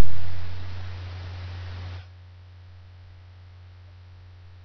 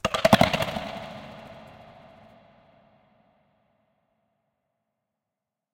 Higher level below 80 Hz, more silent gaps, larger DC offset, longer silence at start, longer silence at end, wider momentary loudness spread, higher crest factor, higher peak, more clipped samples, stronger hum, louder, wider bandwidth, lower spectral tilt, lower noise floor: about the same, -50 dBFS vs -52 dBFS; neither; neither; about the same, 0 s vs 0.05 s; second, 0 s vs 4.1 s; second, 11 LU vs 27 LU; second, 16 dB vs 28 dB; about the same, -4 dBFS vs -2 dBFS; neither; neither; second, -39 LUFS vs -23 LUFS; second, 6.4 kHz vs 17 kHz; about the same, -5 dB/octave vs -5 dB/octave; second, -46 dBFS vs -87 dBFS